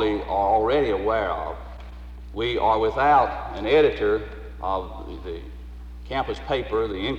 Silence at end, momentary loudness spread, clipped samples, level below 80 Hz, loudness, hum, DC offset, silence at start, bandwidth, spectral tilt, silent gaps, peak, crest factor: 0 s; 21 LU; under 0.1%; -38 dBFS; -23 LUFS; 60 Hz at -40 dBFS; under 0.1%; 0 s; 8 kHz; -7 dB/octave; none; -6 dBFS; 16 dB